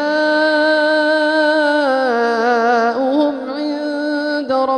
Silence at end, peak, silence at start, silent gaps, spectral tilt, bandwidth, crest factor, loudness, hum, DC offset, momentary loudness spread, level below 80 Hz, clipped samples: 0 s; -2 dBFS; 0 s; none; -3.5 dB/octave; 9.8 kHz; 12 dB; -15 LUFS; none; under 0.1%; 7 LU; -66 dBFS; under 0.1%